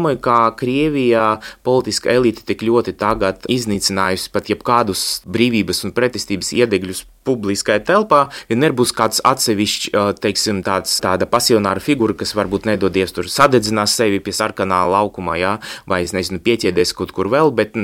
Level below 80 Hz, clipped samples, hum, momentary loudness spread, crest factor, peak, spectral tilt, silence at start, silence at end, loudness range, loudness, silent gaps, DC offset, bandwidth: -46 dBFS; under 0.1%; none; 6 LU; 16 dB; 0 dBFS; -4 dB/octave; 0 s; 0 s; 2 LU; -16 LUFS; none; under 0.1%; 17 kHz